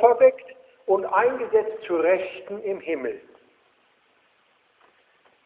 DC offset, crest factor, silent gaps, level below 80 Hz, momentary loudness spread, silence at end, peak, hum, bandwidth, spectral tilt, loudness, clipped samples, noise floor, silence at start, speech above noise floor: under 0.1%; 20 dB; none; -70 dBFS; 14 LU; 2.25 s; -4 dBFS; none; 4 kHz; -8.5 dB/octave; -23 LUFS; under 0.1%; -64 dBFS; 0 s; 41 dB